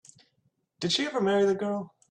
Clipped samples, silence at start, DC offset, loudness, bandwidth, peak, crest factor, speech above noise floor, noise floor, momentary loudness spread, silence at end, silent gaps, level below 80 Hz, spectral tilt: under 0.1%; 0.8 s; under 0.1%; -27 LUFS; 10 kHz; -14 dBFS; 14 dB; 47 dB; -73 dBFS; 10 LU; 0.25 s; none; -72 dBFS; -4.5 dB/octave